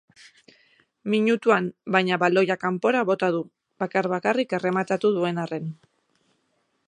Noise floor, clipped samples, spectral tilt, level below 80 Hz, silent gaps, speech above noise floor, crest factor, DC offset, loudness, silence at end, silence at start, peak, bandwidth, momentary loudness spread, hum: -71 dBFS; under 0.1%; -6.5 dB/octave; -76 dBFS; none; 48 dB; 22 dB; under 0.1%; -23 LUFS; 1.15 s; 1.05 s; -4 dBFS; 10 kHz; 10 LU; none